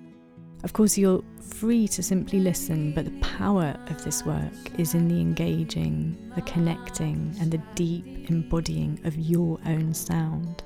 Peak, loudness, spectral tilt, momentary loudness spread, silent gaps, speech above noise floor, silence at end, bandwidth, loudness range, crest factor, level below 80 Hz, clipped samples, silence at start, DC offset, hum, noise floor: -10 dBFS; -26 LUFS; -6 dB/octave; 7 LU; none; 21 dB; 0 s; 17 kHz; 3 LU; 16 dB; -42 dBFS; under 0.1%; 0 s; under 0.1%; none; -47 dBFS